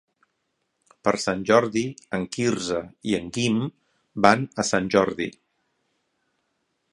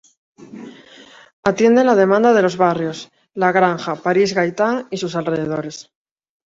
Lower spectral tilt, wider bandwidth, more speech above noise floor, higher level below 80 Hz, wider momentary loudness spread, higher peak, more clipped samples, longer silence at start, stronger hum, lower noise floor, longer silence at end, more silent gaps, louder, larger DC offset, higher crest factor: about the same, -4.5 dB/octave vs -5.5 dB/octave; first, 11.5 kHz vs 7.8 kHz; first, 52 dB vs 28 dB; about the same, -58 dBFS vs -60 dBFS; second, 11 LU vs 20 LU; about the same, 0 dBFS vs -2 dBFS; neither; first, 1.05 s vs 0.4 s; neither; first, -75 dBFS vs -44 dBFS; first, 1.65 s vs 0.7 s; second, none vs 1.33-1.43 s; second, -24 LUFS vs -17 LUFS; neither; first, 26 dB vs 16 dB